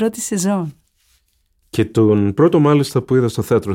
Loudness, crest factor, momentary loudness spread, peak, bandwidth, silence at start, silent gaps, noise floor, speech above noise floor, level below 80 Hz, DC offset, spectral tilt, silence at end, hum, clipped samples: -16 LUFS; 14 dB; 9 LU; -2 dBFS; 17 kHz; 0 s; none; -62 dBFS; 47 dB; -52 dBFS; under 0.1%; -6.5 dB/octave; 0 s; none; under 0.1%